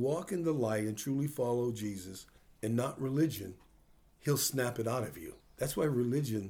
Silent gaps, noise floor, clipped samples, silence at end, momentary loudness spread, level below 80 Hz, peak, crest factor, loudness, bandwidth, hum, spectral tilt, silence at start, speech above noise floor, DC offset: none; -64 dBFS; under 0.1%; 0 s; 13 LU; -64 dBFS; -18 dBFS; 16 dB; -34 LUFS; over 20 kHz; none; -5.5 dB/octave; 0 s; 30 dB; under 0.1%